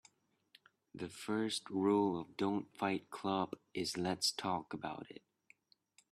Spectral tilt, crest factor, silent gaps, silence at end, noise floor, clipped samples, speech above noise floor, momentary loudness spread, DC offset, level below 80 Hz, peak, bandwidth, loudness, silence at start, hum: -4.5 dB/octave; 20 dB; none; 0.95 s; -72 dBFS; under 0.1%; 34 dB; 14 LU; under 0.1%; -78 dBFS; -20 dBFS; 14 kHz; -38 LUFS; 0.95 s; none